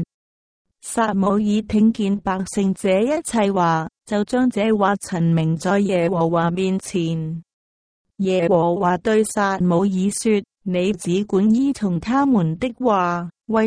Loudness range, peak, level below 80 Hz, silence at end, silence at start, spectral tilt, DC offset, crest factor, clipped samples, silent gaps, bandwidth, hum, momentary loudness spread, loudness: 2 LU; -4 dBFS; -50 dBFS; 0 s; 0 s; -6.5 dB/octave; under 0.1%; 14 dB; under 0.1%; 0.14-0.65 s, 7.53-8.05 s; 10.5 kHz; none; 6 LU; -20 LUFS